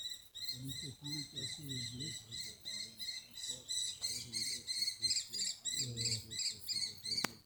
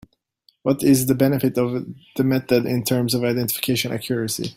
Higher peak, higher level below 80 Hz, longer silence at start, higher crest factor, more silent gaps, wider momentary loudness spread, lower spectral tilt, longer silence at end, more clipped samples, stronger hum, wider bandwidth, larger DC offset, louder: second, -8 dBFS vs -4 dBFS; second, -72 dBFS vs -56 dBFS; second, 0 s vs 0.65 s; first, 34 dB vs 18 dB; neither; about the same, 9 LU vs 7 LU; second, -1 dB/octave vs -5 dB/octave; about the same, 0 s vs 0.05 s; neither; neither; first, over 20 kHz vs 16.5 kHz; neither; second, -39 LUFS vs -21 LUFS